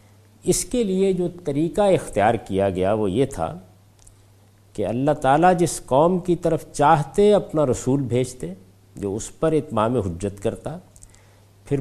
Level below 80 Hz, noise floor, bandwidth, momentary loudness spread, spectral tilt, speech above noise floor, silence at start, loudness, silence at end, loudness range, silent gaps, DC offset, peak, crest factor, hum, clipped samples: -44 dBFS; -53 dBFS; 15 kHz; 12 LU; -6 dB/octave; 32 dB; 0.45 s; -21 LUFS; 0 s; 6 LU; none; under 0.1%; -2 dBFS; 18 dB; none; under 0.1%